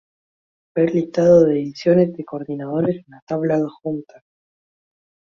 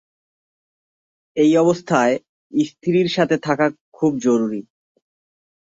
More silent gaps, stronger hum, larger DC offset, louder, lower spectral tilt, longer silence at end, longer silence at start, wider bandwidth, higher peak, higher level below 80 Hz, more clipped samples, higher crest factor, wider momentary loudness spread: second, 3.22-3.27 s vs 2.29-2.50 s, 3.81-3.92 s; neither; neither; about the same, -19 LUFS vs -19 LUFS; first, -8.5 dB/octave vs -6 dB/octave; first, 1.35 s vs 1.15 s; second, 0.75 s vs 1.35 s; second, 7 kHz vs 7.8 kHz; about the same, -2 dBFS vs -2 dBFS; first, -58 dBFS vs -64 dBFS; neither; about the same, 18 dB vs 18 dB; first, 15 LU vs 9 LU